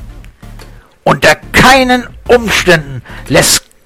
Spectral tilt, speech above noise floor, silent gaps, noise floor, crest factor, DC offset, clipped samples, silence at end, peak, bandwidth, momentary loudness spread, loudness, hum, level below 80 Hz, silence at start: -3 dB/octave; 25 dB; none; -34 dBFS; 10 dB; under 0.1%; 0.5%; 0.25 s; 0 dBFS; over 20 kHz; 9 LU; -8 LUFS; none; -28 dBFS; 0 s